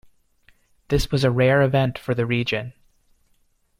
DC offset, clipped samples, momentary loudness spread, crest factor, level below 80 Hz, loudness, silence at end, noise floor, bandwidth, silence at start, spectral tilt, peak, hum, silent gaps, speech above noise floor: under 0.1%; under 0.1%; 8 LU; 18 dB; -40 dBFS; -21 LUFS; 1.1 s; -64 dBFS; 15.5 kHz; 0.9 s; -6.5 dB/octave; -6 dBFS; none; none; 44 dB